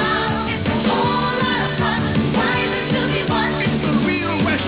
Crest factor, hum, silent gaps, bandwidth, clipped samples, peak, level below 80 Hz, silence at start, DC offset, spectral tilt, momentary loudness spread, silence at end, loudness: 12 dB; none; none; 4 kHz; under 0.1%; -6 dBFS; -38 dBFS; 0 s; under 0.1%; -10 dB/octave; 2 LU; 0 s; -19 LUFS